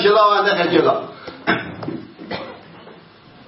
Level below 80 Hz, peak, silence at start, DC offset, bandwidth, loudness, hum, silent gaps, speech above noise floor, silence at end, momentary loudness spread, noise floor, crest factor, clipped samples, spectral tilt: -60 dBFS; -2 dBFS; 0 s; under 0.1%; 6 kHz; -17 LUFS; none; none; 30 dB; 0.55 s; 20 LU; -45 dBFS; 18 dB; under 0.1%; -7.5 dB/octave